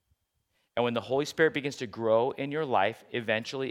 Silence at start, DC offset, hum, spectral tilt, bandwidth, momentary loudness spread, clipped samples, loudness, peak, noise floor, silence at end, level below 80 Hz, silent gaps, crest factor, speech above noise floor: 0.75 s; under 0.1%; none; -5 dB/octave; 15 kHz; 7 LU; under 0.1%; -29 LUFS; -10 dBFS; -76 dBFS; 0 s; -74 dBFS; none; 20 dB; 48 dB